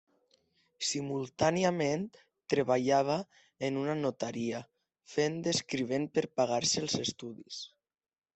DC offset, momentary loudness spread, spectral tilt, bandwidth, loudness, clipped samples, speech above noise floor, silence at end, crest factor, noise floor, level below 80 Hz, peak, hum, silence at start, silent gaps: under 0.1%; 15 LU; -4 dB/octave; 8.4 kHz; -32 LUFS; under 0.1%; 40 dB; 0.7 s; 20 dB; -72 dBFS; -72 dBFS; -12 dBFS; none; 0.8 s; none